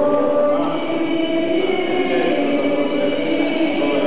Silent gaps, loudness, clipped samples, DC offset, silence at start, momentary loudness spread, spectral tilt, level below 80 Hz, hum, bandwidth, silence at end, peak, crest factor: none; -19 LUFS; under 0.1%; 4%; 0 s; 3 LU; -9.5 dB/octave; -62 dBFS; none; 4 kHz; 0 s; -8 dBFS; 10 dB